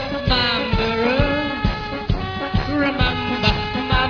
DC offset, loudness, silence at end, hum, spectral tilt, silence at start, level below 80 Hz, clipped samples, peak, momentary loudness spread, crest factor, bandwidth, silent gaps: under 0.1%; -20 LUFS; 0 s; none; -6.5 dB/octave; 0 s; -28 dBFS; under 0.1%; -2 dBFS; 6 LU; 18 dB; 5.4 kHz; none